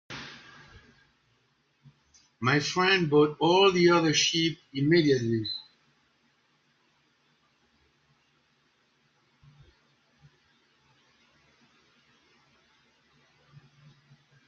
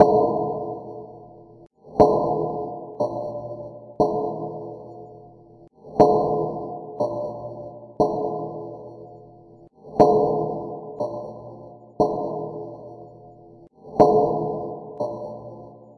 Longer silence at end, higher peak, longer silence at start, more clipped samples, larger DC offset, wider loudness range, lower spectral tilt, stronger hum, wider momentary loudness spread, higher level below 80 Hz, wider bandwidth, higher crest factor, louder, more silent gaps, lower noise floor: first, 8.85 s vs 0.05 s; second, -10 dBFS vs 0 dBFS; about the same, 0.1 s vs 0 s; neither; neither; first, 9 LU vs 5 LU; second, -4.5 dB/octave vs -9 dB/octave; neither; second, 18 LU vs 24 LU; second, -68 dBFS vs -54 dBFS; second, 7.4 kHz vs 9.6 kHz; about the same, 20 dB vs 24 dB; about the same, -24 LUFS vs -23 LUFS; neither; first, -70 dBFS vs -49 dBFS